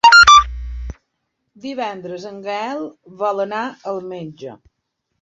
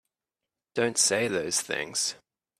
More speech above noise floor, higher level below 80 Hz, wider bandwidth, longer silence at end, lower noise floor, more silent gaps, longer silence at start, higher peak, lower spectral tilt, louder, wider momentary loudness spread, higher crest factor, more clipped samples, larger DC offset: second, 48 dB vs 61 dB; first, -36 dBFS vs -70 dBFS; second, 8.4 kHz vs 15.5 kHz; first, 0.65 s vs 0.45 s; second, -73 dBFS vs -89 dBFS; neither; second, 0.05 s vs 0.75 s; first, 0 dBFS vs -10 dBFS; about the same, -2 dB/octave vs -1.5 dB/octave; first, -15 LUFS vs -26 LUFS; first, 25 LU vs 7 LU; about the same, 16 dB vs 20 dB; neither; neither